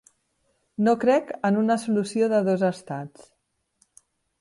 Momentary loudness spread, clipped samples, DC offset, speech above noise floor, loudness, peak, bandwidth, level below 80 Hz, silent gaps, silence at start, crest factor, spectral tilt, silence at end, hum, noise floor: 14 LU; under 0.1%; under 0.1%; 48 dB; -23 LUFS; -10 dBFS; 11.5 kHz; -70 dBFS; none; 0.8 s; 16 dB; -6.5 dB/octave; 1.35 s; none; -71 dBFS